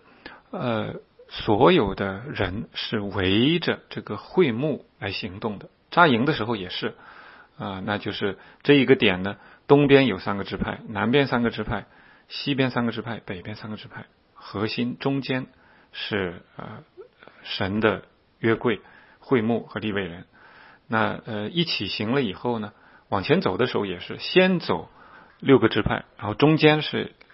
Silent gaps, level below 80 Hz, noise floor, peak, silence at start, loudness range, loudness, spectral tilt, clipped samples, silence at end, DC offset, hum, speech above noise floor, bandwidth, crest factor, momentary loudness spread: none; -52 dBFS; -51 dBFS; 0 dBFS; 0.25 s; 8 LU; -24 LUFS; -10 dB/octave; under 0.1%; 0.25 s; under 0.1%; none; 27 dB; 5.8 kHz; 24 dB; 17 LU